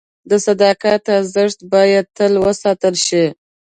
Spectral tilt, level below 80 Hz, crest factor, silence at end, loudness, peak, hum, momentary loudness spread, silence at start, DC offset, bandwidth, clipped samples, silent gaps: -4 dB/octave; -54 dBFS; 14 dB; 0.3 s; -15 LUFS; 0 dBFS; none; 5 LU; 0.25 s; under 0.1%; 9.4 kHz; under 0.1%; none